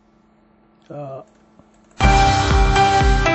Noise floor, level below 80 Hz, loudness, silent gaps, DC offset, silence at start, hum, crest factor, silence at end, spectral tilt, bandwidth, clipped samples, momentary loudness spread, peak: -55 dBFS; -22 dBFS; -15 LUFS; none; under 0.1%; 0.9 s; none; 16 dB; 0 s; -5 dB/octave; 8.4 kHz; under 0.1%; 21 LU; -2 dBFS